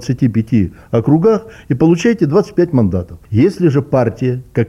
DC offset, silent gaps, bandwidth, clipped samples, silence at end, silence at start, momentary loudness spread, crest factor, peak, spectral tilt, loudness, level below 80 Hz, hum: under 0.1%; none; 12 kHz; under 0.1%; 0 s; 0 s; 7 LU; 12 dB; -2 dBFS; -8.5 dB/octave; -14 LUFS; -42 dBFS; none